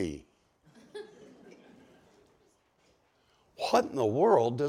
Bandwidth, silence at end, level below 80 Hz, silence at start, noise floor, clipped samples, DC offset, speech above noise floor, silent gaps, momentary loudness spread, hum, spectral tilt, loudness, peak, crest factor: 15 kHz; 0 s; -66 dBFS; 0 s; -69 dBFS; under 0.1%; under 0.1%; 42 dB; none; 23 LU; none; -6 dB/octave; -28 LUFS; -12 dBFS; 22 dB